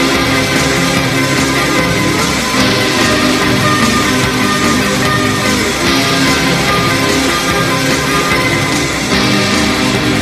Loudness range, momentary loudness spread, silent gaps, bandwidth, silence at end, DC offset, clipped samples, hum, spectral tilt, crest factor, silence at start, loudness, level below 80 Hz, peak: 1 LU; 2 LU; none; 14 kHz; 0 s; under 0.1%; under 0.1%; none; -3.5 dB/octave; 12 dB; 0 s; -11 LUFS; -32 dBFS; 0 dBFS